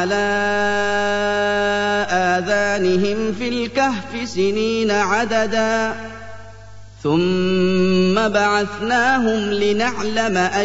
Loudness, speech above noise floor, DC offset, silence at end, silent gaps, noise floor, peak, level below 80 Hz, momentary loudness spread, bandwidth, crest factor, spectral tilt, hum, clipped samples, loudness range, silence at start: -18 LUFS; 22 dB; 1%; 0 s; none; -40 dBFS; -4 dBFS; -46 dBFS; 6 LU; 8 kHz; 14 dB; -5 dB/octave; none; under 0.1%; 3 LU; 0 s